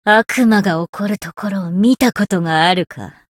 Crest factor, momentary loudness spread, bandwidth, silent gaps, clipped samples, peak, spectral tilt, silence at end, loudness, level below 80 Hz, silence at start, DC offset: 14 dB; 10 LU; 17 kHz; 0.89-0.93 s; under 0.1%; 0 dBFS; -5.5 dB/octave; 0.25 s; -15 LUFS; -54 dBFS; 0.05 s; under 0.1%